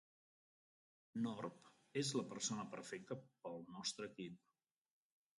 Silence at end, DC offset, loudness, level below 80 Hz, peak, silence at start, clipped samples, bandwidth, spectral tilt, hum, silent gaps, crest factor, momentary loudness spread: 1 s; under 0.1%; -47 LUFS; -88 dBFS; -28 dBFS; 1.15 s; under 0.1%; 11.5 kHz; -3.5 dB/octave; none; none; 20 dB; 11 LU